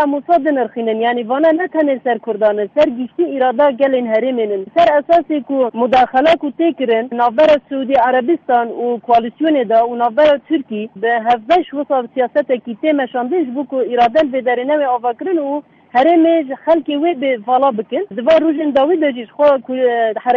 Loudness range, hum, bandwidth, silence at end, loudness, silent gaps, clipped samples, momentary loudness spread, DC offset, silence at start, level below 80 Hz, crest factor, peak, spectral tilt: 2 LU; none; 7 kHz; 0 s; -15 LUFS; none; under 0.1%; 6 LU; under 0.1%; 0 s; -56 dBFS; 12 dB; -2 dBFS; -6.5 dB/octave